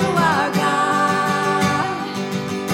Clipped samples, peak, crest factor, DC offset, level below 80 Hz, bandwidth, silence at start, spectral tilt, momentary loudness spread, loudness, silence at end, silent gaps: under 0.1%; -4 dBFS; 16 dB; under 0.1%; -58 dBFS; 17 kHz; 0 s; -5 dB/octave; 7 LU; -19 LUFS; 0 s; none